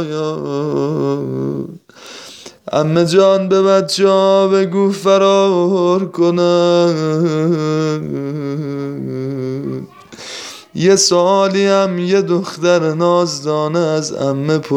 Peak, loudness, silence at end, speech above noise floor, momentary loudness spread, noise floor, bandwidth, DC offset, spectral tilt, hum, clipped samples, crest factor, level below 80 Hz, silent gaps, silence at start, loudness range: 0 dBFS; -14 LUFS; 0 s; 22 dB; 16 LU; -36 dBFS; 13.5 kHz; under 0.1%; -5.5 dB/octave; none; under 0.1%; 14 dB; -60 dBFS; none; 0 s; 7 LU